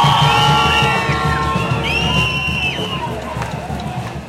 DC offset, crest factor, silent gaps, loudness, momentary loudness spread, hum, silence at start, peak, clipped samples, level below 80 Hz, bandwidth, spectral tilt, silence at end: under 0.1%; 16 dB; none; -16 LUFS; 12 LU; none; 0 s; 0 dBFS; under 0.1%; -32 dBFS; 16 kHz; -4.5 dB/octave; 0 s